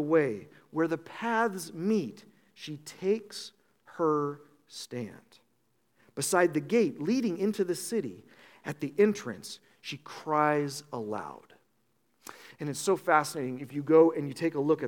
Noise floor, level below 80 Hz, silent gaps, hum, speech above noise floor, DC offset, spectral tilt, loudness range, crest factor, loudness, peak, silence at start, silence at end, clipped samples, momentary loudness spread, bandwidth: -74 dBFS; -82 dBFS; none; none; 45 dB; under 0.1%; -5 dB/octave; 6 LU; 22 dB; -29 LUFS; -8 dBFS; 0 s; 0 s; under 0.1%; 18 LU; 18 kHz